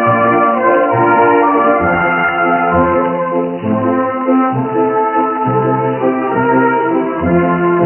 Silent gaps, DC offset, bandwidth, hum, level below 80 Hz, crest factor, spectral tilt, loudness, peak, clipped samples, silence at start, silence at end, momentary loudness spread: none; under 0.1%; 3.2 kHz; none; -46 dBFS; 12 dB; -6.5 dB/octave; -12 LUFS; -2 dBFS; under 0.1%; 0 s; 0 s; 5 LU